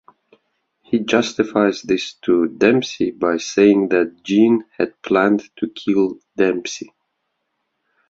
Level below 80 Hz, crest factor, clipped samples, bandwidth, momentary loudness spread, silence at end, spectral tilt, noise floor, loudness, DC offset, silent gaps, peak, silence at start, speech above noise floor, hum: -60 dBFS; 18 dB; under 0.1%; 7.8 kHz; 9 LU; 1.25 s; -5 dB/octave; -73 dBFS; -18 LUFS; under 0.1%; none; -2 dBFS; 0.9 s; 56 dB; none